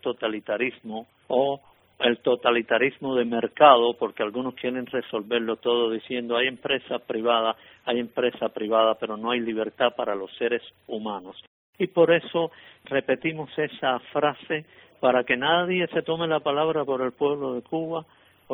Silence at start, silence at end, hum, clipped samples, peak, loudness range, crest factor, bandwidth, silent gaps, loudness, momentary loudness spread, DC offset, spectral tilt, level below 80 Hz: 0.05 s; 0 s; none; under 0.1%; 0 dBFS; 5 LU; 24 dB; 4 kHz; 11.47-11.73 s; -25 LUFS; 9 LU; under 0.1%; -8 dB/octave; -70 dBFS